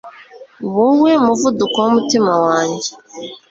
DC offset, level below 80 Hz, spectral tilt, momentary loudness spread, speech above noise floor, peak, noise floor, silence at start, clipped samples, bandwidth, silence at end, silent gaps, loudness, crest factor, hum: under 0.1%; -58 dBFS; -4.5 dB/octave; 17 LU; 25 dB; -2 dBFS; -40 dBFS; 0.05 s; under 0.1%; 7.8 kHz; 0.15 s; none; -14 LUFS; 14 dB; none